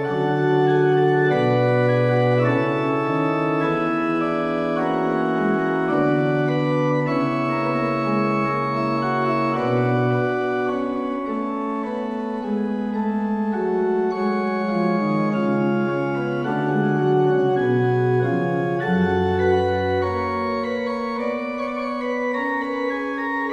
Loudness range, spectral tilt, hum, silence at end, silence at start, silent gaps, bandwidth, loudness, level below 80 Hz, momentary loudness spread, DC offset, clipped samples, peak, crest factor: 4 LU; -8.5 dB/octave; none; 0 s; 0 s; none; 8 kHz; -21 LUFS; -56 dBFS; 7 LU; under 0.1%; under 0.1%; -8 dBFS; 14 dB